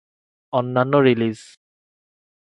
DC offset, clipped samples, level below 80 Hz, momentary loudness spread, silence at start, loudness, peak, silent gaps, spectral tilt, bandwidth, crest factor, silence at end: under 0.1%; under 0.1%; -66 dBFS; 9 LU; 0.55 s; -19 LUFS; -2 dBFS; none; -7.5 dB/octave; 11 kHz; 20 dB; 1 s